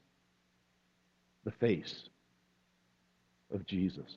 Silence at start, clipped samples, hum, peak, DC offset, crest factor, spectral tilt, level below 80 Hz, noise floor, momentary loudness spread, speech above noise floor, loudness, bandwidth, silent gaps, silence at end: 1.45 s; under 0.1%; 60 Hz at -65 dBFS; -18 dBFS; under 0.1%; 24 dB; -7.5 dB/octave; -70 dBFS; -74 dBFS; 13 LU; 38 dB; -37 LUFS; 7.2 kHz; none; 0 s